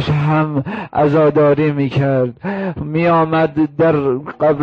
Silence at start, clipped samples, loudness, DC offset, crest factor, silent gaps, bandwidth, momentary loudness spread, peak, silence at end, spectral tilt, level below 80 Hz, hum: 0 s; under 0.1%; -15 LUFS; under 0.1%; 10 dB; none; 6.2 kHz; 9 LU; -6 dBFS; 0 s; -9.5 dB/octave; -46 dBFS; none